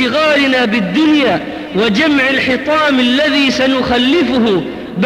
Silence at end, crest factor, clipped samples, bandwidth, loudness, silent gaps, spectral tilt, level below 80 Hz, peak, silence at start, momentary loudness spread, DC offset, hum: 0 s; 10 dB; under 0.1%; 13.5 kHz; -12 LUFS; none; -5 dB/octave; -44 dBFS; -2 dBFS; 0 s; 4 LU; under 0.1%; none